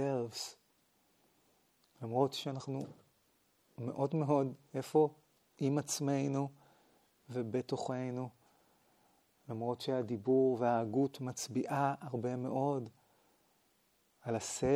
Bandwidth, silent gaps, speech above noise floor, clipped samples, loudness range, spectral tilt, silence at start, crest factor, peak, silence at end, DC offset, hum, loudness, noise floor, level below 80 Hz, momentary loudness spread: 16.5 kHz; none; 39 dB; under 0.1%; 7 LU; -6 dB/octave; 0 s; 20 dB; -18 dBFS; 0 s; under 0.1%; none; -36 LUFS; -74 dBFS; -74 dBFS; 12 LU